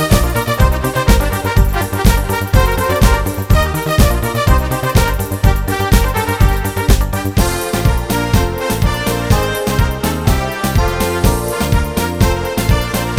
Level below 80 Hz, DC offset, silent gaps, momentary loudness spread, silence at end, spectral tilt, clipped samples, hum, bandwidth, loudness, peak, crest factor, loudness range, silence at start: -18 dBFS; under 0.1%; none; 3 LU; 0 s; -5 dB/octave; under 0.1%; none; 16.5 kHz; -15 LUFS; 0 dBFS; 14 dB; 2 LU; 0 s